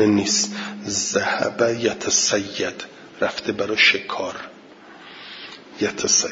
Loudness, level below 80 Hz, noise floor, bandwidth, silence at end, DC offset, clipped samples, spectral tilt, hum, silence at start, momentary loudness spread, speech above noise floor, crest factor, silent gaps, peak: -20 LUFS; -62 dBFS; -44 dBFS; 7.8 kHz; 0 s; under 0.1%; under 0.1%; -2 dB/octave; none; 0 s; 21 LU; 23 dB; 20 dB; none; -2 dBFS